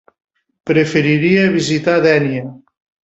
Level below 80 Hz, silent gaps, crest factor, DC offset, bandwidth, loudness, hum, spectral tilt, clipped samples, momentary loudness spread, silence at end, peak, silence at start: -54 dBFS; none; 14 dB; under 0.1%; 8.2 kHz; -14 LUFS; none; -6 dB/octave; under 0.1%; 12 LU; 0.5 s; -2 dBFS; 0.65 s